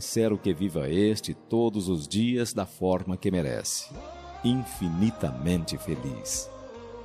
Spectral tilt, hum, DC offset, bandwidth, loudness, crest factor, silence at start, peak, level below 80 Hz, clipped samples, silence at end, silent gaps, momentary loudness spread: -5.5 dB/octave; none; under 0.1%; 14.5 kHz; -28 LUFS; 16 dB; 0 s; -12 dBFS; -52 dBFS; under 0.1%; 0 s; none; 7 LU